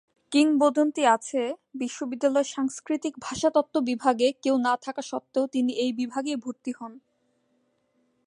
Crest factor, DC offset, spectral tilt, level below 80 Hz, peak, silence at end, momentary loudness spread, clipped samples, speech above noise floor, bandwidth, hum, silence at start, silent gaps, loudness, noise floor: 18 dB; under 0.1%; -3.5 dB/octave; -70 dBFS; -8 dBFS; 1.3 s; 12 LU; under 0.1%; 45 dB; 11.5 kHz; none; 0.3 s; none; -26 LUFS; -71 dBFS